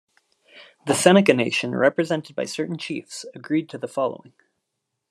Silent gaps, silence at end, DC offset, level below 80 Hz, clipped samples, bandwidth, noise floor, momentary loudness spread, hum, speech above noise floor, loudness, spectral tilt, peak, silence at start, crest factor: none; 0.95 s; under 0.1%; -70 dBFS; under 0.1%; 13 kHz; -79 dBFS; 17 LU; none; 58 dB; -22 LUFS; -4.5 dB/octave; 0 dBFS; 0.55 s; 22 dB